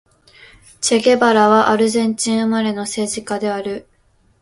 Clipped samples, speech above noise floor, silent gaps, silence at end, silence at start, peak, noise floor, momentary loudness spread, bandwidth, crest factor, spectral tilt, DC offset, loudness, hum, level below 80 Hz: under 0.1%; 41 dB; none; 0.6 s; 0.8 s; 0 dBFS; -57 dBFS; 10 LU; 11.5 kHz; 16 dB; -3.5 dB/octave; under 0.1%; -16 LUFS; none; -58 dBFS